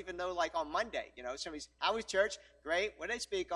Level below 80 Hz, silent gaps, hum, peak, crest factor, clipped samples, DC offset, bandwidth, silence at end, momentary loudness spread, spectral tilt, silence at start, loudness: -64 dBFS; none; none; -16 dBFS; 20 dB; under 0.1%; under 0.1%; 14 kHz; 0 s; 9 LU; -2 dB/octave; 0 s; -37 LUFS